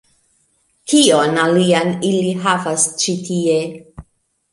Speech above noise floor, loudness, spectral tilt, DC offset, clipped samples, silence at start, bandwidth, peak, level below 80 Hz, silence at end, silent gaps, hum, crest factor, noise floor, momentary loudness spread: 46 dB; -15 LUFS; -4 dB/octave; under 0.1%; under 0.1%; 0.85 s; 11.5 kHz; 0 dBFS; -54 dBFS; 0.5 s; none; none; 18 dB; -61 dBFS; 8 LU